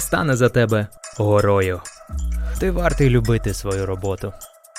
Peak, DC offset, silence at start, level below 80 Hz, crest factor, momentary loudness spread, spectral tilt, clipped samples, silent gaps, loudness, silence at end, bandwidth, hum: -2 dBFS; under 0.1%; 0 s; -30 dBFS; 18 dB; 13 LU; -6 dB/octave; under 0.1%; none; -20 LUFS; 0 s; 16 kHz; none